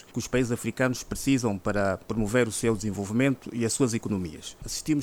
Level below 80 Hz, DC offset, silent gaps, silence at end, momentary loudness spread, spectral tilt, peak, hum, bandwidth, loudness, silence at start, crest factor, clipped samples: -48 dBFS; under 0.1%; none; 0 s; 7 LU; -5 dB/octave; -10 dBFS; none; 19 kHz; -27 LUFS; 0.15 s; 16 dB; under 0.1%